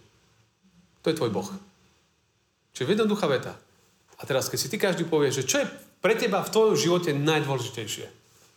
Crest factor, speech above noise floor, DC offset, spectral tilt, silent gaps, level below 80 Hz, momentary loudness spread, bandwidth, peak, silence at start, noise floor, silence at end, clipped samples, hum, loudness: 18 dB; 44 dB; under 0.1%; -4.5 dB/octave; none; -72 dBFS; 13 LU; 19.5 kHz; -8 dBFS; 1.05 s; -70 dBFS; 0.45 s; under 0.1%; none; -26 LUFS